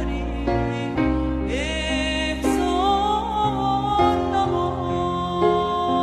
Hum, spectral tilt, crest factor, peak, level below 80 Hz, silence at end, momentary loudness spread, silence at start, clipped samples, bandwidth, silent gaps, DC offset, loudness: none; -5.5 dB/octave; 16 dB; -6 dBFS; -32 dBFS; 0 s; 5 LU; 0 s; under 0.1%; 13.5 kHz; none; under 0.1%; -22 LUFS